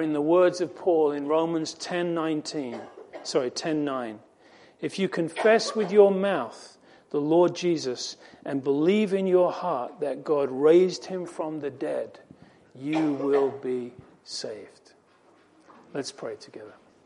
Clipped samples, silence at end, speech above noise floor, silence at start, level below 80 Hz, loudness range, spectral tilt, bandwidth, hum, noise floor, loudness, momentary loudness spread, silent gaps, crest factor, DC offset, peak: under 0.1%; 0.35 s; 34 dB; 0 s; -76 dBFS; 7 LU; -5.5 dB/octave; 11 kHz; none; -59 dBFS; -25 LUFS; 17 LU; none; 20 dB; under 0.1%; -6 dBFS